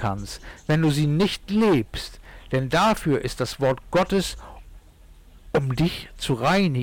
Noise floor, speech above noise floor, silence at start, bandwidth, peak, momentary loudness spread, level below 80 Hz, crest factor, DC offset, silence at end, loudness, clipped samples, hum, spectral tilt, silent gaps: -49 dBFS; 26 dB; 0 s; 18 kHz; -14 dBFS; 12 LU; -42 dBFS; 10 dB; under 0.1%; 0 s; -23 LUFS; under 0.1%; none; -6 dB/octave; none